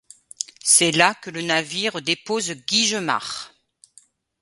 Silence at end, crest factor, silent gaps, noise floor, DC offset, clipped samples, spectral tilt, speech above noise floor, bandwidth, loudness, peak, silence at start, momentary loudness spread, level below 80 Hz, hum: 0.95 s; 22 dB; none; -56 dBFS; under 0.1%; under 0.1%; -1.5 dB/octave; 34 dB; 12 kHz; -20 LUFS; 0 dBFS; 0.4 s; 17 LU; -68 dBFS; none